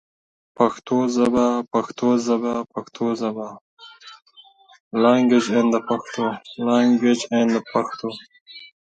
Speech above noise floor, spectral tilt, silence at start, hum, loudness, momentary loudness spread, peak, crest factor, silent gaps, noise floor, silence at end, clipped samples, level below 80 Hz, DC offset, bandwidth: 31 dB; -5.5 dB/octave; 0.6 s; none; -21 LUFS; 16 LU; -2 dBFS; 20 dB; 3.61-3.77 s, 4.80-4.91 s, 8.41-8.46 s; -51 dBFS; 0.35 s; under 0.1%; -62 dBFS; under 0.1%; 8.8 kHz